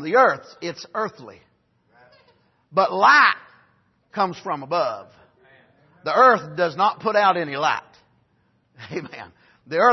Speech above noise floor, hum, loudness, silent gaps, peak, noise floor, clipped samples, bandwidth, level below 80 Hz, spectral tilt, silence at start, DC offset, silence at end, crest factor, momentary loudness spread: 45 dB; none; -20 LUFS; none; -2 dBFS; -65 dBFS; under 0.1%; 6.2 kHz; -72 dBFS; -4.5 dB/octave; 0 s; under 0.1%; 0 s; 20 dB; 18 LU